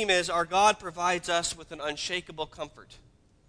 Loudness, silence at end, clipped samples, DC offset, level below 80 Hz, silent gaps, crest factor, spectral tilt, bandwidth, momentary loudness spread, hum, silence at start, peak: -28 LUFS; 0.5 s; under 0.1%; under 0.1%; -56 dBFS; none; 20 dB; -2 dB/octave; 11 kHz; 14 LU; none; 0 s; -8 dBFS